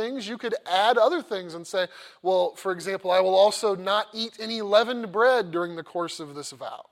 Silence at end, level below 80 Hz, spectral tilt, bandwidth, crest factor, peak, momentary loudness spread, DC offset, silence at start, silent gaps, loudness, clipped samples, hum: 0.1 s; -78 dBFS; -3.5 dB/octave; 15.5 kHz; 18 dB; -6 dBFS; 13 LU; under 0.1%; 0 s; none; -25 LUFS; under 0.1%; none